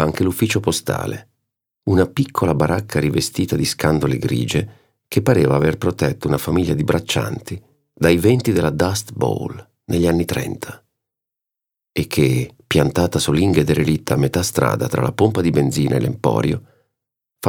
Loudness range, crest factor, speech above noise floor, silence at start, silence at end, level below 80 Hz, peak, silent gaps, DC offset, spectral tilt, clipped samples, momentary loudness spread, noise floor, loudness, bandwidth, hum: 4 LU; 18 dB; 68 dB; 0 s; 0 s; -42 dBFS; 0 dBFS; none; under 0.1%; -6 dB/octave; under 0.1%; 10 LU; -85 dBFS; -19 LUFS; 20 kHz; none